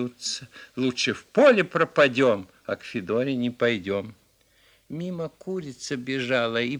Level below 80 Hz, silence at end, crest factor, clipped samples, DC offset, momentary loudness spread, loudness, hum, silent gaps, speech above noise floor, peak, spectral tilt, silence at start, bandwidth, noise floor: -66 dBFS; 0 s; 22 dB; under 0.1%; under 0.1%; 15 LU; -25 LUFS; none; none; 37 dB; -4 dBFS; -4.5 dB/octave; 0 s; 12 kHz; -61 dBFS